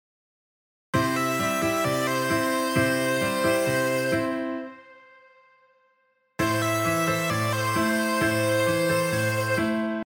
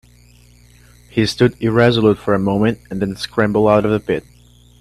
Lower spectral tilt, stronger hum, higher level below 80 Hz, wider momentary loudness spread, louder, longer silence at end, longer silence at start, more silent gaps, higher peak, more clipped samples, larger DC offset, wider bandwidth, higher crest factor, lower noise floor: second, -4.5 dB/octave vs -6.5 dB/octave; second, none vs 60 Hz at -35 dBFS; second, -56 dBFS vs -44 dBFS; second, 4 LU vs 10 LU; second, -24 LUFS vs -16 LUFS; second, 0 s vs 0.6 s; second, 0.95 s vs 1.15 s; neither; second, -10 dBFS vs 0 dBFS; neither; neither; first, over 20 kHz vs 13.5 kHz; about the same, 16 dB vs 16 dB; first, -68 dBFS vs -47 dBFS